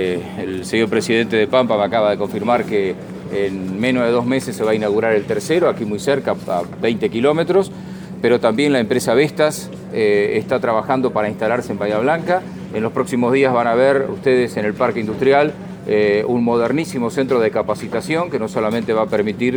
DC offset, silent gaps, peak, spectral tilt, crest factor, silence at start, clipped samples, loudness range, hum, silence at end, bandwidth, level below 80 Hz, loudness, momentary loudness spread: under 0.1%; none; 0 dBFS; -5.5 dB/octave; 16 dB; 0 s; under 0.1%; 2 LU; none; 0 s; over 20 kHz; -52 dBFS; -18 LUFS; 7 LU